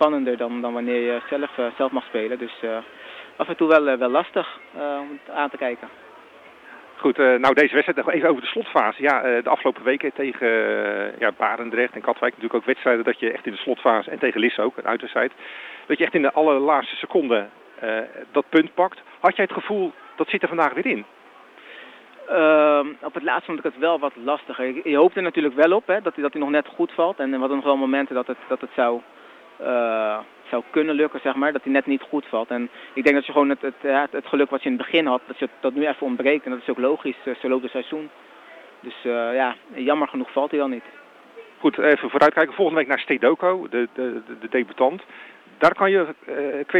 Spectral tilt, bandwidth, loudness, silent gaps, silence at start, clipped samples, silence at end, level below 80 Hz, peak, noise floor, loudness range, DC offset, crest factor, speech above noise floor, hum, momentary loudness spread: -6 dB/octave; 8 kHz; -22 LUFS; none; 0 s; under 0.1%; 0 s; -72 dBFS; -4 dBFS; -47 dBFS; 5 LU; under 0.1%; 18 dB; 25 dB; none; 11 LU